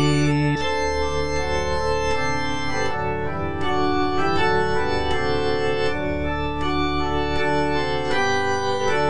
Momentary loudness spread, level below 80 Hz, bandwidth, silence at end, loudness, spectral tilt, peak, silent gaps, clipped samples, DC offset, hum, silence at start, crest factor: 5 LU; -36 dBFS; 10 kHz; 0 s; -23 LUFS; -5.5 dB/octave; -8 dBFS; none; under 0.1%; 4%; none; 0 s; 14 dB